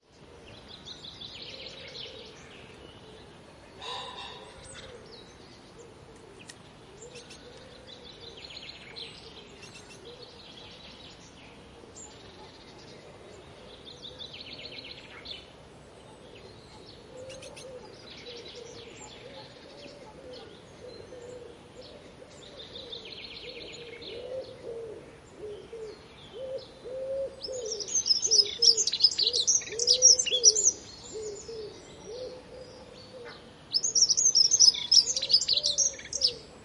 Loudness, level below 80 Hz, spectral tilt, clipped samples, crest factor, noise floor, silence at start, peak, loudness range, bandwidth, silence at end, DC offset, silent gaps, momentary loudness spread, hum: -22 LUFS; -62 dBFS; 0.5 dB/octave; under 0.1%; 26 dB; -52 dBFS; 0.2 s; -6 dBFS; 25 LU; 11.5 kHz; 0 s; under 0.1%; none; 28 LU; none